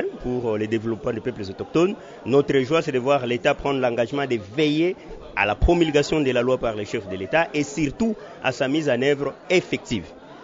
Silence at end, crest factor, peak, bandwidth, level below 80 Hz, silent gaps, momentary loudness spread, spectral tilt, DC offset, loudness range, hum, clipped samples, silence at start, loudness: 0 s; 18 dB; -4 dBFS; 7.8 kHz; -38 dBFS; none; 9 LU; -5.5 dB/octave; under 0.1%; 2 LU; none; under 0.1%; 0 s; -23 LUFS